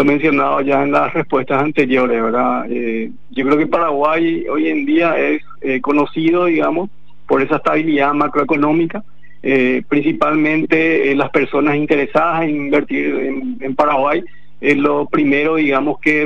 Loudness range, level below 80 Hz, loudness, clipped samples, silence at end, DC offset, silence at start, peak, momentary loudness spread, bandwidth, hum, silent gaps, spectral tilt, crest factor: 2 LU; -52 dBFS; -15 LUFS; under 0.1%; 0 s; 3%; 0 s; -2 dBFS; 6 LU; 7.2 kHz; none; none; -7.5 dB/octave; 14 dB